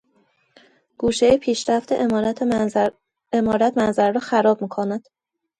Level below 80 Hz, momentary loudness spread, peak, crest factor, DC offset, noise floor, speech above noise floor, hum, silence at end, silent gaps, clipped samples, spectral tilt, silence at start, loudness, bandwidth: -52 dBFS; 8 LU; -4 dBFS; 16 dB; under 0.1%; -63 dBFS; 44 dB; none; 0.6 s; none; under 0.1%; -5 dB/octave; 1 s; -20 LUFS; 11 kHz